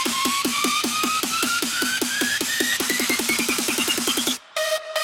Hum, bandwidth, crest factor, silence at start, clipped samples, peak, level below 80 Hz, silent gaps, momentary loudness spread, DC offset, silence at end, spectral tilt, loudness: none; 18 kHz; 22 dB; 0 s; under 0.1%; -2 dBFS; -62 dBFS; none; 3 LU; under 0.1%; 0 s; -0.5 dB/octave; -21 LUFS